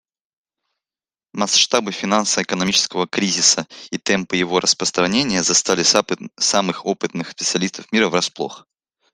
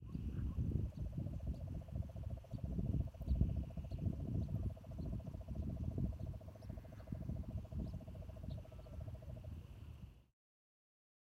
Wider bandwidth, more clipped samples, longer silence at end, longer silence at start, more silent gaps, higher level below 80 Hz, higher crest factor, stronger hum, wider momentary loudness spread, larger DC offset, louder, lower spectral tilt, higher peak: about the same, 13.5 kHz vs 12.5 kHz; neither; second, 0.55 s vs 1.1 s; first, 1.35 s vs 0 s; neither; second, -58 dBFS vs -48 dBFS; about the same, 20 dB vs 22 dB; neither; about the same, 10 LU vs 11 LU; neither; first, -17 LUFS vs -46 LUFS; second, -2 dB/octave vs -9.5 dB/octave; first, 0 dBFS vs -22 dBFS